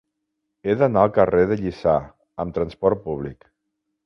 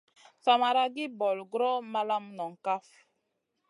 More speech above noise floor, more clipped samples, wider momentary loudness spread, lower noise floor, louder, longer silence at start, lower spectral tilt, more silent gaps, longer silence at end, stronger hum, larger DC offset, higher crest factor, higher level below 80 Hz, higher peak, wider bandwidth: first, 58 dB vs 51 dB; neither; first, 14 LU vs 10 LU; about the same, -78 dBFS vs -80 dBFS; first, -21 LUFS vs -30 LUFS; first, 0.65 s vs 0.45 s; first, -9 dB/octave vs -4 dB/octave; neither; second, 0.7 s vs 0.9 s; neither; neither; about the same, 20 dB vs 20 dB; first, -46 dBFS vs under -90 dBFS; first, -2 dBFS vs -10 dBFS; second, 6.4 kHz vs 11 kHz